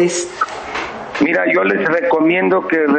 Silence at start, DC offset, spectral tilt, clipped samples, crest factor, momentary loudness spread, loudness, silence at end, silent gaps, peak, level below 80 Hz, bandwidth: 0 s; under 0.1%; -4.5 dB/octave; under 0.1%; 10 dB; 10 LU; -16 LUFS; 0 s; none; -4 dBFS; -54 dBFS; 9.2 kHz